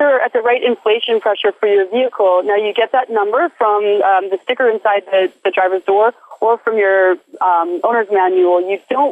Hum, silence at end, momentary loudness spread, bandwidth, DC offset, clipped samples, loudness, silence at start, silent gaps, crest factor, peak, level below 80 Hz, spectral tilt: none; 0 s; 4 LU; 4 kHz; under 0.1%; under 0.1%; -14 LUFS; 0 s; none; 10 dB; -4 dBFS; -76 dBFS; -5 dB/octave